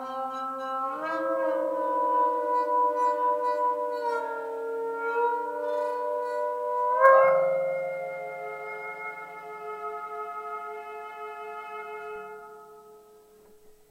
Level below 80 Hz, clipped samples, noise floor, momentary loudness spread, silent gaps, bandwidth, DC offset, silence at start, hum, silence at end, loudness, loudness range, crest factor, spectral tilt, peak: -76 dBFS; under 0.1%; -55 dBFS; 14 LU; none; 15.5 kHz; under 0.1%; 0 s; none; 0.2 s; -28 LUFS; 13 LU; 22 dB; -5 dB/octave; -6 dBFS